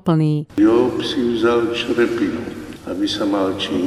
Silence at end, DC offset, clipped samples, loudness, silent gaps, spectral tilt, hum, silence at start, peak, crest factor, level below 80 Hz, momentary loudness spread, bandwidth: 0 s; under 0.1%; under 0.1%; -18 LUFS; none; -6.5 dB/octave; none; 0.05 s; -4 dBFS; 14 dB; -48 dBFS; 11 LU; 13 kHz